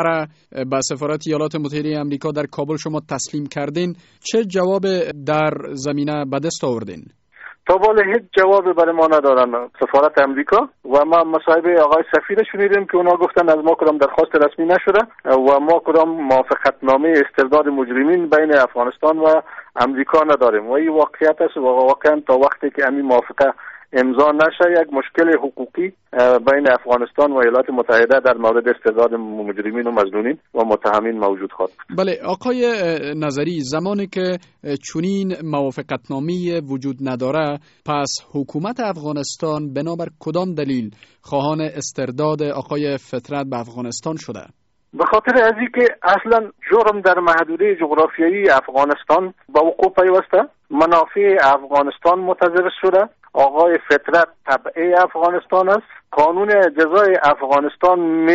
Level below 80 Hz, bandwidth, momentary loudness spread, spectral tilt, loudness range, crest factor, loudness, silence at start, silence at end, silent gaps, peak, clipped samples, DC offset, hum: -56 dBFS; 8 kHz; 11 LU; -4 dB/octave; 8 LU; 14 dB; -16 LUFS; 0 s; 0 s; none; -4 dBFS; under 0.1%; under 0.1%; none